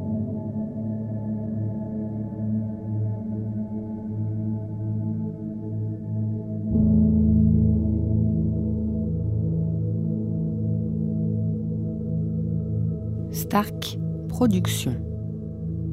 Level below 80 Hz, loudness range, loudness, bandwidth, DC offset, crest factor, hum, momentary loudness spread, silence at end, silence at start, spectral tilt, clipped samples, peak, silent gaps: -38 dBFS; 7 LU; -26 LUFS; 16 kHz; under 0.1%; 16 dB; none; 10 LU; 0 s; 0 s; -7.5 dB/octave; under 0.1%; -8 dBFS; none